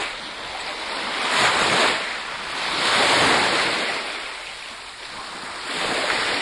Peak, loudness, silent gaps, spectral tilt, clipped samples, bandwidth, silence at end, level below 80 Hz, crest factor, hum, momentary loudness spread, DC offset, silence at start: -4 dBFS; -21 LUFS; none; -1.5 dB/octave; under 0.1%; 11.5 kHz; 0 s; -54 dBFS; 18 dB; none; 16 LU; under 0.1%; 0 s